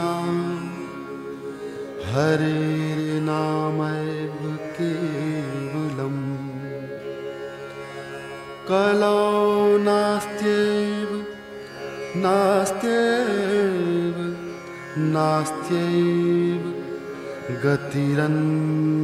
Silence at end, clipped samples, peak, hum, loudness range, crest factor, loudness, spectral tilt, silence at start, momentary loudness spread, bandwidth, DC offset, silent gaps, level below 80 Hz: 0 s; under 0.1%; -6 dBFS; none; 7 LU; 16 dB; -23 LUFS; -6.5 dB/octave; 0 s; 15 LU; 15 kHz; under 0.1%; none; -60 dBFS